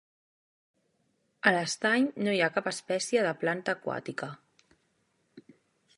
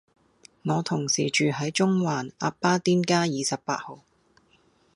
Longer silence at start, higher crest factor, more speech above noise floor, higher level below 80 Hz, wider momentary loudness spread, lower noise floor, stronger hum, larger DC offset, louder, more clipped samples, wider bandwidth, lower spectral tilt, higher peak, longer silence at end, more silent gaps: first, 1.45 s vs 0.65 s; first, 26 dB vs 20 dB; first, 45 dB vs 38 dB; second, -78 dBFS vs -68 dBFS; about the same, 10 LU vs 9 LU; first, -74 dBFS vs -63 dBFS; neither; neither; second, -29 LUFS vs -25 LUFS; neither; about the same, 11.5 kHz vs 11.5 kHz; about the same, -4 dB/octave vs -4.5 dB/octave; about the same, -6 dBFS vs -8 dBFS; second, 0.55 s vs 1 s; neither